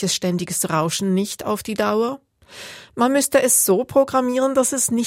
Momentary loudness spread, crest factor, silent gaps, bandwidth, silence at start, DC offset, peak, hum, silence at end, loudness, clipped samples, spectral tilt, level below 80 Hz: 15 LU; 16 dB; none; 16.5 kHz; 0 s; under 0.1%; -4 dBFS; none; 0 s; -19 LUFS; under 0.1%; -3.5 dB/octave; -58 dBFS